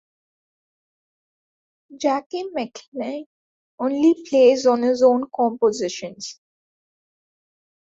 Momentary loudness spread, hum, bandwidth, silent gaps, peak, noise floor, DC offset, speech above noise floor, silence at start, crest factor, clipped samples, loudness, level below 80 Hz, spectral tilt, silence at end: 16 LU; none; 7.8 kHz; 2.26-2.30 s, 2.88-2.92 s, 3.26-3.78 s; -4 dBFS; under -90 dBFS; under 0.1%; over 70 dB; 1.9 s; 18 dB; under 0.1%; -20 LUFS; -68 dBFS; -4 dB/octave; 1.6 s